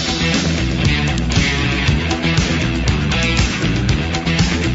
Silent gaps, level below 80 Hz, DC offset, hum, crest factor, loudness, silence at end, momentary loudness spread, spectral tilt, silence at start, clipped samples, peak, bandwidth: none; -24 dBFS; under 0.1%; none; 14 dB; -16 LUFS; 0 s; 2 LU; -4.5 dB/octave; 0 s; under 0.1%; -4 dBFS; 8 kHz